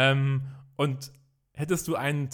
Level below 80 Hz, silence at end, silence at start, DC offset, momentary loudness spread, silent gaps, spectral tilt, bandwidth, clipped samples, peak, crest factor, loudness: -62 dBFS; 0 s; 0 s; under 0.1%; 15 LU; none; -5.5 dB/octave; 18 kHz; under 0.1%; -10 dBFS; 18 dB; -29 LUFS